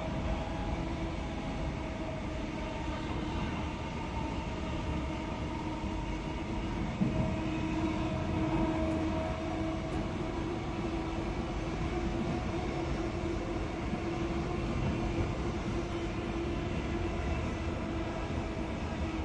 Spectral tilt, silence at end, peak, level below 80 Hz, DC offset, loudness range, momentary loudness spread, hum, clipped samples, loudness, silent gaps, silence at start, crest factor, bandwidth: -7 dB/octave; 0 s; -18 dBFS; -42 dBFS; under 0.1%; 4 LU; 4 LU; none; under 0.1%; -35 LUFS; none; 0 s; 16 dB; 10.5 kHz